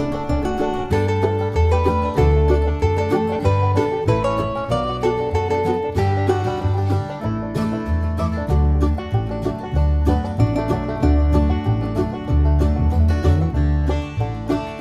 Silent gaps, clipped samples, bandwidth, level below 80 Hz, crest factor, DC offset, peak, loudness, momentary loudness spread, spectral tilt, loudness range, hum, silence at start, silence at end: none; under 0.1%; 9 kHz; -24 dBFS; 14 dB; under 0.1%; -4 dBFS; -20 LUFS; 6 LU; -8.5 dB/octave; 3 LU; none; 0 s; 0 s